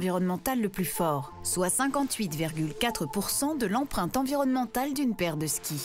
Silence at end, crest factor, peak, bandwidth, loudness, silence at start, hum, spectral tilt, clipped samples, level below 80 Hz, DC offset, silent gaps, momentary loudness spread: 0 s; 14 dB; -14 dBFS; 16 kHz; -29 LUFS; 0 s; none; -4 dB/octave; under 0.1%; -52 dBFS; under 0.1%; none; 4 LU